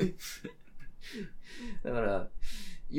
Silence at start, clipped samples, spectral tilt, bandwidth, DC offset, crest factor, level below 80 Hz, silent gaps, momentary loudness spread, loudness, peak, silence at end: 0 s; under 0.1%; -5.5 dB/octave; 16.5 kHz; under 0.1%; 18 dB; -44 dBFS; none; 17 LU; -39 LUFS; -16 dBFS; 0 s